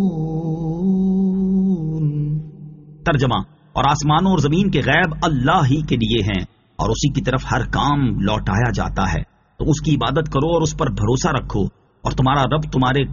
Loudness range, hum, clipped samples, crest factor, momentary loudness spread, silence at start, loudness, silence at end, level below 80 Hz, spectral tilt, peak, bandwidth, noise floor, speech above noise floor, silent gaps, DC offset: 3 LU; none; under 0.1%; 16 dB; 9 LU; 0 s; -19 LUFS; 0 s; -32 dBFS; -5.5 dB/octave; -2 dBFS; 7.4 kHz; -38 dBFS; 21 dB; none; under 0.1%